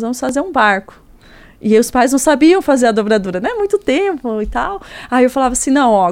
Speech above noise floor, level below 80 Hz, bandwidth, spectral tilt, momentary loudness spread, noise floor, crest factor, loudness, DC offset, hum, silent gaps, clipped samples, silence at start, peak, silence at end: 28 dB; -38 dBFS; 16.5 kHz; -4 dB/octave; 9 LU; -42 dBFS; 14 dB; -14 LUFS; under 0.1%; none; none; under 0.1%; 0 s; 0 dBFS; 0 s